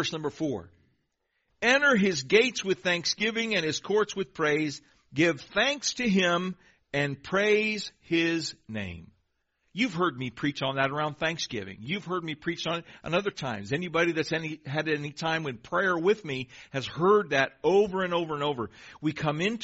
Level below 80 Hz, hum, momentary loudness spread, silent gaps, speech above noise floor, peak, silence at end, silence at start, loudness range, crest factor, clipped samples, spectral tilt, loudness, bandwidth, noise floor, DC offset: -62 dBFS; none; 12 LU; none; 49 dB; -8 dBFS; 0 s; 0 s; 5 LU; 20 dB; under 0.1%; -3 dB/octave; -28 LUFS; 8 kHz; -77 dBFS; under 0.1%